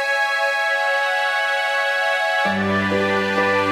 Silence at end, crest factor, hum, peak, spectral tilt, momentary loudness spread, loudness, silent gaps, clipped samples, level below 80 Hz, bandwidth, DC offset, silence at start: 0 s; 12 dB; none; -6 dBFS; -4 dB/octave; 1 LU; -19 LUFS; none; under 0.1%; -62 dBFS; 16 kHz; under 0.1%; 0 s